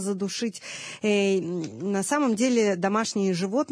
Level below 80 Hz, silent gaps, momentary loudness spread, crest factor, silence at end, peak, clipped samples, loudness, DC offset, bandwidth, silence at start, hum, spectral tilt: -76 dBFS; none; 9 LU; 14 dB; 0.05 s; -10 dBFS; under 0.1%; -25 LUFS; under 0.1%; 11 kHz; 0 s; none; -4.5 dB/octave